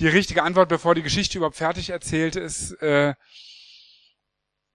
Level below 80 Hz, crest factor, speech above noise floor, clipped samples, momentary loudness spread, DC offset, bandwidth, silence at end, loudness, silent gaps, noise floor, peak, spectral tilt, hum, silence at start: -46 dBFS; 22 dB; 58 dB; under 0.1%; 10 LU; under 0.1%; 12 kHz; 1.2 s; -22 LUFS; none; -80 dBFS; -2 dBFS; -4.5 dB/octave; none; 0 s